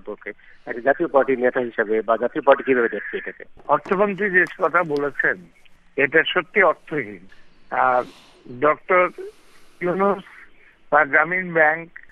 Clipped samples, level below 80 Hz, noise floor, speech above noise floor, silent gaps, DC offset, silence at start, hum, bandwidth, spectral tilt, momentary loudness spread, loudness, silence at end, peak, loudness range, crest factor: under 0.1%; -58 dBFS; -48 dBFS; 27 dB; none; under 0.1%; 0.05 s; none; 7.6 kHz; -6.5 dB/octave; 15 LU; -20 LUFS; 0.25 s; -2 dBFS; 2 LU; 20 dB